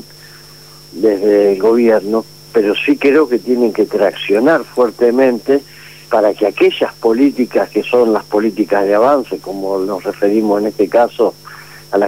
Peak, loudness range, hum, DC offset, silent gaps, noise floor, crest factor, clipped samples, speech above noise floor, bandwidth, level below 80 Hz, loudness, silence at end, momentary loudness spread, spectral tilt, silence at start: -2 dBFS; 2 LU; 50 Hz at -45 dBFS; 0.3%; none; -38 dBFS; 12 dB; under 0.1%; 26 dB; 16 kHz; -56 dBFS; -14 LUFS; 0 s; 7 LU; -5.5 dB/octave; 0.9 s